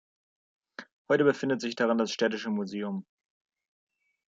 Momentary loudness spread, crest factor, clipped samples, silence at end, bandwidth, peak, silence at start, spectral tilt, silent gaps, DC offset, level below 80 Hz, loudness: 22 LU; 20 dB; under 0.1%; 1.25 s; 7.8 kHz; -10 dBFS; 0.8 s; -5 dB/octave; 0.92-1.05 s; under 0.1%; -78 dBFS; -28 LUFS